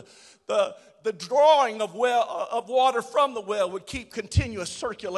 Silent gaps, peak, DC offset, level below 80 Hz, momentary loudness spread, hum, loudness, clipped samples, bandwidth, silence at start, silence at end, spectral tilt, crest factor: none; -8 dBFS; under 0.1%; -42 dBFS; 13 LU; none; -25 LUFS; under 0.1%; 12.5 kHz; 0.5 s; 0 s; -4.5 dB/octave; 18 dB